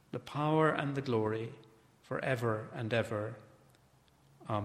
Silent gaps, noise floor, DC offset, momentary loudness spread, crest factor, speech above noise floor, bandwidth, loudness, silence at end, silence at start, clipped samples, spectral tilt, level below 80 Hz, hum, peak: none; -66 dBFS; under 0.1%; 14 LU; 22 dB; 32 dB; 14 kHz; -34 LUFS; 0 s; 0.15 s; under 0.1%; -7 dB/octave; -70 dBFS; none; -14 dBFS